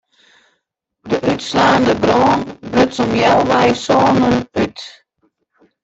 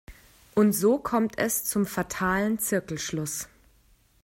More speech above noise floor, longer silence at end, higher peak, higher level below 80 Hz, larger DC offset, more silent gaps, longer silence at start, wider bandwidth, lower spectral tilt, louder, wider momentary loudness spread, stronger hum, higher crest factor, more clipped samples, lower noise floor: first, 59 dB vs 36 dB; first, 0.95 s vs 0.8 s; first, -2 dBFS vs -10 dBFS; first, -46 dBFS vs -54 dBFS; neither; neither; first, 1.05 s vs 0.1 s; second, 8.2 kHz vs 16.5 kHz; about the same, -5.5 dB/octave vs -4.5 dB/octave; first, -14 LUFS vs -26 LUFS; about the same, 8 LU vs 9 LU; neither; about the same, 14 dB vs 16 dB; neither; first, -72 dBFS vs -61 dBFS